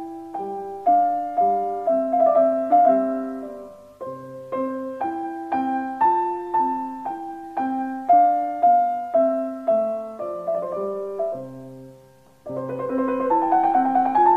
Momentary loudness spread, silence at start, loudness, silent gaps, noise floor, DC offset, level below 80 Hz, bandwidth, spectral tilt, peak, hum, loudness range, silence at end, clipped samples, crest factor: 16 LU; 0 s; -22 LUFS; none; -52 dBFS; under 0.1%; -66 dBFS; 4.2 kHz; -8 dB/octave; -6 dBFS; none; 7 LU; 0 s; under 0.1%; 16 dB